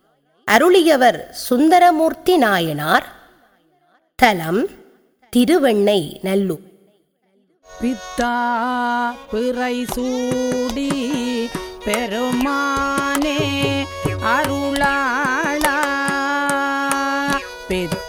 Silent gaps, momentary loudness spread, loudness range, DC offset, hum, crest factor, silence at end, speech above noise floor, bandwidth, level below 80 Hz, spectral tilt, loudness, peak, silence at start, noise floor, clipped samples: none; 10 LU; 6 LU; under 0.1%; none; 18 dB; 0 s; 44 dB; over 20 kHz; -44 dBFS; -4.5 dB/octave; -18 LUFS; 0 dBFS; 0.45 s; -62 dBFS; under 0.1%